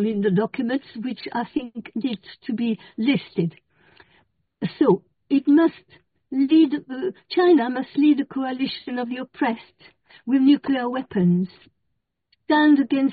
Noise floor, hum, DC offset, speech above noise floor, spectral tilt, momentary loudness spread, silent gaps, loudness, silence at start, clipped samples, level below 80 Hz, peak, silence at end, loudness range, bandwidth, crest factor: -77 dBFS; none; under 0.1%; 55 dB; -5.5 dB/octave; 13 LU; none; -22 LUFS; 0 s; under 0.1%; -66 dBFS; -6 dBFS; 0 s; 7 LU; 4.9 kHz; 16 dB